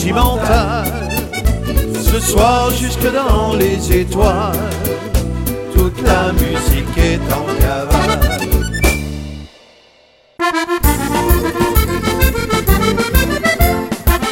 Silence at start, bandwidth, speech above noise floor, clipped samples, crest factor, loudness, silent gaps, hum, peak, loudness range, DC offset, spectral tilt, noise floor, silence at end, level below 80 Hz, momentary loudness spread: 0 s; 17 kHz; 36 dB; under 0.1%; 14 dB; -15 LUFS; none; none; 0 dBFS; 3 LU; under 0.1%; -5 dB/octave; -49 dBFS; 0 s; -18 dBFS; 6 LU